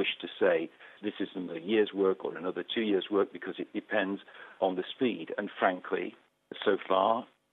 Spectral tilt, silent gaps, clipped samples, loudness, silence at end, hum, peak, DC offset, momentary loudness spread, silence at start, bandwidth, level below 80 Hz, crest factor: -7.5 dB/octave; none; under 0.1%; -31 LUFS; 0.3 s; none; -12 dBFS; under 0.1%; 12 LU; 0 s; 4.2 kHz; -84 dBFS; 20 dB